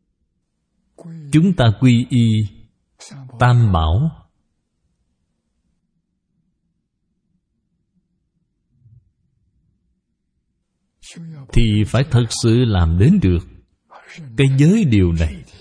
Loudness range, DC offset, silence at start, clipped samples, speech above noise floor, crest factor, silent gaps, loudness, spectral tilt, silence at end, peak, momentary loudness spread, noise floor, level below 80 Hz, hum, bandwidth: 8 LU; under 0.1%; 1.05 s; under 0.1%; 56 dB; 18 dB; none; -16 LUFS; -7 dB/octave; 0.15 s; 0 dBFS; 22 LU; -71 dBFS; -32 dBFS; none; 10.5 kHz